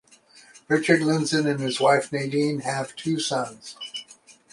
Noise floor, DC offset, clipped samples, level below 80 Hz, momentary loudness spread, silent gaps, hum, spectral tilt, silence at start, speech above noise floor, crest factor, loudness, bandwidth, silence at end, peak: -53 dBFS; under 0.1%; under 0.1%; -68 dBFS; 14 LU; none; none; -4.5 dB/octave; 0.55 s; 30 dB; 20 dB; -24 LUFS; 11.5 kHz; 0.4 s; -4 dBFS